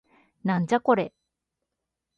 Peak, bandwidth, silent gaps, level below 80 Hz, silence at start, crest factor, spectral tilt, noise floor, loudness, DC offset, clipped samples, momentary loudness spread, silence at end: -8 dBFS; 8.8 kHz; none; -70 dBFS; 0.45 s; 20 dB; -7.5 dB/octave; -84 dBFS; -25 LUFS; under 0.1%; under 0.1%; 11 LU; 1.1 s